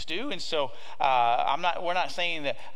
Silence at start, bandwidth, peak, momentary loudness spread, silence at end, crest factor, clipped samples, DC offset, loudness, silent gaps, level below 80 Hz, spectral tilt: 0 s; 12 kHz; -10 dBFS; 8 LU; 0.05 s; 18 dB; under 0.1%; 3%; -28 LUFS; none; -66 dBFS; -3 dB/octave